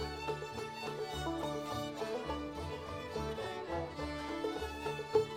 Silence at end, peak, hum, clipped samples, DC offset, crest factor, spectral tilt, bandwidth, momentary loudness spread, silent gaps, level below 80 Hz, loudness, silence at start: 0 s; -18 dBFS; none; under 0.1%; under 0.1%; 22 dB; -5 dB/octave; 17 kHz; 4 LU; none; -54 dBFS; -40 LUFS; 0 s